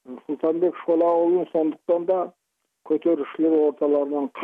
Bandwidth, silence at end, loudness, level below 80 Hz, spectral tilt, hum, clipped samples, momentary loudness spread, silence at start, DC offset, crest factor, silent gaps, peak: 3.8 kHz; 0 s; -22 LUFS; -78 dBFS; -9 dB/octave; none; under 0.1%; 7 LU; 0.1 s; under 0.1%; 12 dB; none; -10 dBFS